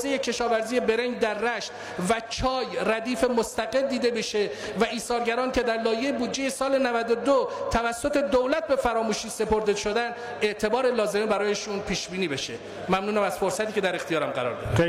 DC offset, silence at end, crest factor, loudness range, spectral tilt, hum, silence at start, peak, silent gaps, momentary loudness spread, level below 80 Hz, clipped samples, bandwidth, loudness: under 0.1%; 0 s; 14 dB; 2 LU; -4 dB/octave; none; 0 s; -12 dBFS; none; 5 LU; -48 dBFS; under 0.1%; 16 kHz; -26 LUFS